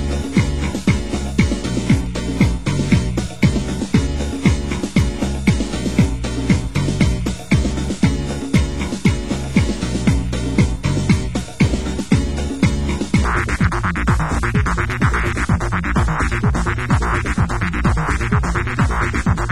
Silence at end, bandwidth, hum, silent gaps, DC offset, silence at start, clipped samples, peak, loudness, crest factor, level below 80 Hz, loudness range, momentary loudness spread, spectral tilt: 0 s; 16 kHz; none; none; 2%; 0 s; under 0.1%; 0 dBFS; -19 LUFS; 16 dB; -24 dBFS; 1 LU; 3 LU; -6 dB/octave